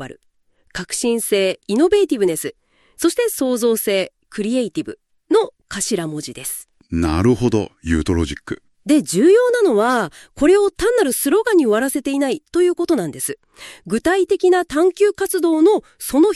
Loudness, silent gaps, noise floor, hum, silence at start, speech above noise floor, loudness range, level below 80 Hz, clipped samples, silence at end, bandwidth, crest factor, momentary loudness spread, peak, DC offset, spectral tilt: -18 LUFS; none; -60 dBFS; none; 0 s; 43 dB; 5 LU; -40 dBFS; under 0.1%; 0 s; 13.5 kHz; 14 dB; 13 LU; -4 dBFS; under 0.1%; -4.5 dB/octave